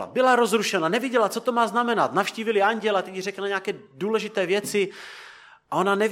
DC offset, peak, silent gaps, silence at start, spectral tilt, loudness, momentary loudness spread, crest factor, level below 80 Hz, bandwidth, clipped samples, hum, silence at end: under 0.1%; -6 dBFS; none; 0 s; -4 dB/octave; -23 LUFS; 10 LU; 18 dB; -78 dBFS; 16.5 kHz; under 0.1%; none; 0 s